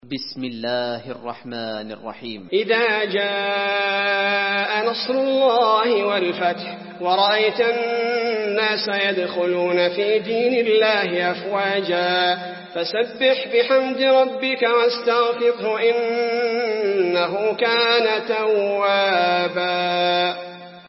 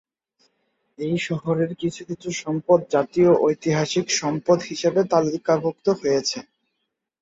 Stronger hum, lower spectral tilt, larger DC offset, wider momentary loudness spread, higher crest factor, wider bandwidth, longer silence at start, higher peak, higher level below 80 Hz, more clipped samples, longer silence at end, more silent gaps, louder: neither; first, -7 dB/octave vs -5 dB/octave; neither; about the same, 11 LU vs 10 LU; about the same, 16 dB vs 18 dB; second, 5.8 kHz vs 8 kHz; second, 0 s vs 1 s; about the same, -4 dBFS vs -4 dBFS; second, -74 dBFS vs -62 dBFS; neither; second, 0.05 s vs 0.8 s; neither; first, -19 LUFS vs -22 LUFS